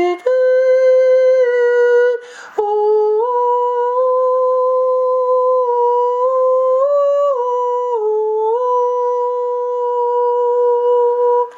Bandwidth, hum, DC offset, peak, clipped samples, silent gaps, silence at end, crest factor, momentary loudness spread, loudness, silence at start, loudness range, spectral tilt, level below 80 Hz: 7.2 kHz; none; under 0.1%; -4 dBFS; under 0.1%; none; 0 s; 10 dB; 6 LU; -15 LUFS; 0 s; 3 LU; -3 dB/octave; -78 dBFS